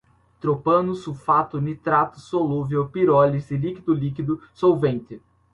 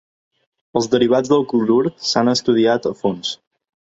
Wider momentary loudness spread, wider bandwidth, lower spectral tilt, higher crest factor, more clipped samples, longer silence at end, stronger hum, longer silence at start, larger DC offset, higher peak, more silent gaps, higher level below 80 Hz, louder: about the same, 9 LU vs 9 LU; first, 10.5 kHz vs 8 kHz; first, -9 dB/octave vs -5 dB/octave; about the same, 18 dB vs 16 dB; neither; second, 0.35 s vs 0.5 s; neither; second, 0.45 s vs 0.75 s; neither; about the same, -4 dBFS vs -2 dBFS; neither; about the same, -54 dBFS vs -58 dBFS; second, -22 LUFS vs -17 LUFS